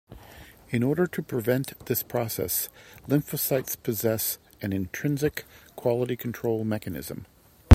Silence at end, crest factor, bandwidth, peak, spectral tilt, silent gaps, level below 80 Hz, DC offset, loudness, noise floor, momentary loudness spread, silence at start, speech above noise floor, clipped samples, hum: 0 s; 26 dB; 16.5 kHz; 0 dBFS; -6 dB/octave; none; -56 dBFS; under 0.1%; -28 LUFS; -49 dBFS; 13 LU; 0.1 s; 21 dB; under 0.1%; none